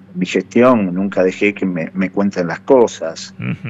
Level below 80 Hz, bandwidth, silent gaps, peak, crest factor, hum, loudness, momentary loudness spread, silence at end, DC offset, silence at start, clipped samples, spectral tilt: -60 dBFS; 8 kHz; none; 0 dBFS; 16 dB; none; -16 LUFS; 12 LU; 0 s; under 0.1%; 0.1 s; under 0.1%; -6.5 dB/octave